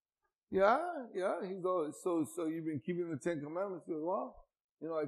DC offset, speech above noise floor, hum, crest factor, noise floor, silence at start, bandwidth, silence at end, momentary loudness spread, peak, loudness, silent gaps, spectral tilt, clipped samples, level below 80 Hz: under 0.1%; 52 dB; none; 22 dB; -88 dBFS; 0.5 s; 13.5 kHz; 0 s; 10 LU; -16 dBFS; -37 LUFS; 4.61-4.77 s; -6.5 dB/octave; under 0.1%; -72 dBFS